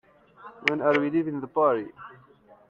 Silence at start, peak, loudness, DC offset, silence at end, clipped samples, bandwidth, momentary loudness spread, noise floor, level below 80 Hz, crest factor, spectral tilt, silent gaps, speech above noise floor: 0.4 s; -2 dBFS; -25 LUFS; under 0.1%; 0.55 s; under 0.1%; 7.2 kHz; 20 LU; -49 dBFS; -70 dBFS; 26 dB; -6.5 dB/octave; none; 24 dB